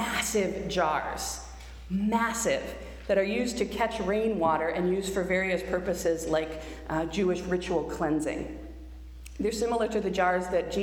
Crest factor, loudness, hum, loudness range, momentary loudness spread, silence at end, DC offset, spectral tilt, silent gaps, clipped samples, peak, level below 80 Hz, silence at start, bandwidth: 16 dB; -29 LUFS; none; 3 LU; 13 LU; 0 s; under 0.1%; -4.5 dB/octave; none; under 0.1%; -12 dBFS; -46 dBFS; 0 s; over 20 kHz